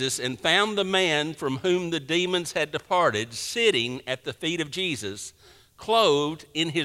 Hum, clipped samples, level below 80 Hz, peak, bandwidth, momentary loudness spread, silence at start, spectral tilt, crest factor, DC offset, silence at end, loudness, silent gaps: none; under 0.1%; -62 dBFS; -6 dBFS; 16 kHz; 9 LU; 0 s; -3.5 dB/octave; 20 dB; under 0.1%; 0 s; -25 LUFS; none